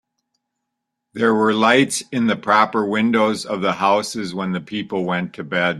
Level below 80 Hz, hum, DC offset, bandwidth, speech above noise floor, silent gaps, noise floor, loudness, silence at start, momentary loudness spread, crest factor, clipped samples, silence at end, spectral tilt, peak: -62 dBFS; none; under 0.1%; 13 kHz; 60 dB; none; -79 dBFS; -19 LUFS; 1.15 s; 10 LU; 18 dB; under 0.1%; 0 s; -4.5 dB/octave; -2 dBFS